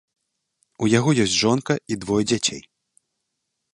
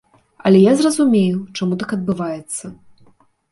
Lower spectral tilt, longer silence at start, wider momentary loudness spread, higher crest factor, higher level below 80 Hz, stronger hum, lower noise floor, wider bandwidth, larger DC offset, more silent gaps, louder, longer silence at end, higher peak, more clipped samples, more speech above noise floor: second, -4.5 dB/octave vs -6 dB/octave; first, 0.8 s vs 0.45 s; second, 7 LU vs 15 LU; about the same, 20 dB vs 16 dB; about the same, -56 dBFS vs -56 dBFS; neither; first, -78 dBFS vs -53 dBFS; about the same, 11.5 kHz vs 11.5 kHz; neither; neither; second, -21 LUFS vs -17 LUFS; first, 1.15 s vs 0.75 s; about the same, -4 dBFS vs -2 dBFS; neither; first, 58 dB vs 37 dB